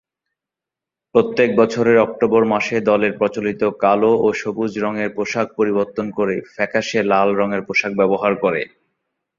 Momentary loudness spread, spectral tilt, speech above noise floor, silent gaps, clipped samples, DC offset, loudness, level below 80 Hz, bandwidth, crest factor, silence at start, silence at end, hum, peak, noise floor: 7 LU; -6 dB/octave; 69 dB; none; under 0.1%; under 0.1%; -18 LUFS; -58 dBFS; 7.6 kHz; 18 dB; 1.15 s; 0.75 s; none; 0 dBFS; -86 dBFS